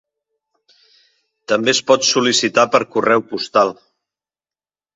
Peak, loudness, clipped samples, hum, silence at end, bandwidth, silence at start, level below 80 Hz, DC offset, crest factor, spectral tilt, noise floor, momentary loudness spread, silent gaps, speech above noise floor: 0 dBFS; -15 LUFS; under 0.1%; none; 1.25 s; 8.2 kHz; 1.5 s; -64 dBFS; under 0.1%; 18 dB; -2.5 dB/octave; under -90 dBFS; 5 LU; none; over 74 dB